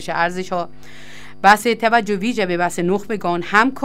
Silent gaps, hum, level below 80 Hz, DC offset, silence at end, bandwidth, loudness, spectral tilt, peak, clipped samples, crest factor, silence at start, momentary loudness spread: none; none; -52 dBFS; 2%; 0 s; 16 kHz; -18 LUFS; -4.5 dB/octave; 0 dBFS; under 0.1%; 18 dB; 0 s; 11 LU